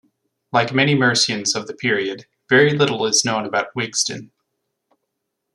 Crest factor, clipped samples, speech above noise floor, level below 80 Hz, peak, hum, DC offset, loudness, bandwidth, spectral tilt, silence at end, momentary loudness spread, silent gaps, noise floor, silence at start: 18 dB; under 0.1%; 59 dB; -64 dBFS; -2 dBFS; none; under 0.1%; -18 LUFS; 12.5 kHz; -3 dB/octave; 1.3 s; 8 LU; none; -77 dBFS; 0.55 s